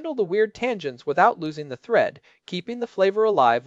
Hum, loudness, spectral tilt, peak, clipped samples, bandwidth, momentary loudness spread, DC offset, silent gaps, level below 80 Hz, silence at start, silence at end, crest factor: none; -23 LUFS; -6 dB/octave; -4 dBFS; under 0.1%; 7.8 kHz; 12 LU; under 0.1%; none; -68 dBFS; 0 s; 0.05 s; 20 dB